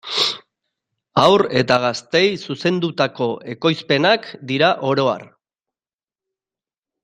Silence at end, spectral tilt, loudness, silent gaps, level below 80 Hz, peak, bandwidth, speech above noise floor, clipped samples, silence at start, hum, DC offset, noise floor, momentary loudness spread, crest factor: 1.8 s; -5 dB/octave; -18 LUFS; none; -60 dBFS; 0 dBFS; 11 kHz; over 72 dB; under 0.1%; 0.05 s; none; under 0.1%; under -90 dBFS; 8 LU; 18 dB